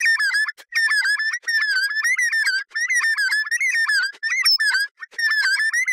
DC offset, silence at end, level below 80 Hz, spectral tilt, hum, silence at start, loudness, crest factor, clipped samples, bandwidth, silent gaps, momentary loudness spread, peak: under 0.1%; 0 s; under -90 dBFS; 7 dB/octave; none; 0 s; -18 LUFS; 12 dB; under 0.1%; 16.5 kHz; 4.91-4.95 s; 5 LU; -8 dBFS